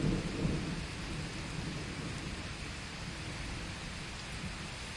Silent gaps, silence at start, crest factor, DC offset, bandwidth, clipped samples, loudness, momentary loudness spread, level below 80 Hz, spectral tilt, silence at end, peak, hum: none; 0 s; 18 dB; under 0.1%; 11.5 kHz; under 0.1%; -40 LUFS; 6 LU; -48 dBFS; -5 dB/octave; 0 s; -20 dBFS; none